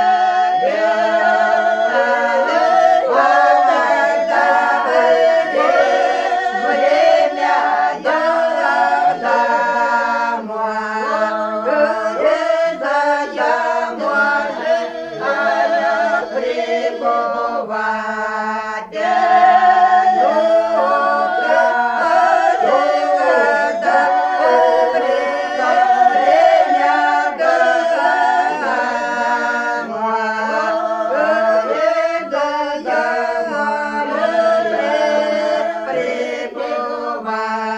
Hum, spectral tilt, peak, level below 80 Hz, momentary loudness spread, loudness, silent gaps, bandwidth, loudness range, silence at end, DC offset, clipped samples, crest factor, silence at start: none; -3.5 dB/octave; 0 dBFS; -60 dBFS; 8 LU; -15 LUFS; none; 8.8 kHz; 4 LU; 0 s; under 0.1%; under 0.1%; 14 dB; 0 s